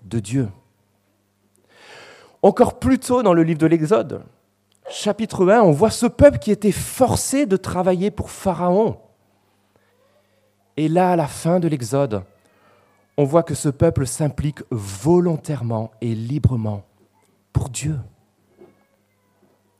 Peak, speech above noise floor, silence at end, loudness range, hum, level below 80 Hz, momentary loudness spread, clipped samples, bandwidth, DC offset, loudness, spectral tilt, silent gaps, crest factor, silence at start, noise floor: 0 dBFS; 46 dB; 1.7 s; 7 LU; 50 Hz at -50 dBFS; -44 dBFS; 12 LU; under 0.1%; 15.5 kHz; under 0.1%; -19 LUFS; -6.5 dB/octave; none; 20 dB; 0.05 s; -64 dBFS